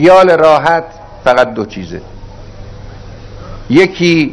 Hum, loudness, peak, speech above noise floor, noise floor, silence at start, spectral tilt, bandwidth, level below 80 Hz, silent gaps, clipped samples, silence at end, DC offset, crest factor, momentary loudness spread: none; -10 LUFS; 0 dBFS; 20 dB; -29 dBFS; 0 s; -6 dB/octave; 11 kHz; -34 dBFS; none; 2%; 0 s; under 0.1%; 12 dB; 25 LU